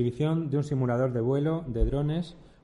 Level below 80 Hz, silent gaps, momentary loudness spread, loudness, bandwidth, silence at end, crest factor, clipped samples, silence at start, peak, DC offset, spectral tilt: -38 dBFS; none; 4 LU; -28 LUFS; 10.5 kHz; 0.2 s; 14 dB; under 0.1%; 0 s; -12 dBFS; under 0.1%; -9 dB/octave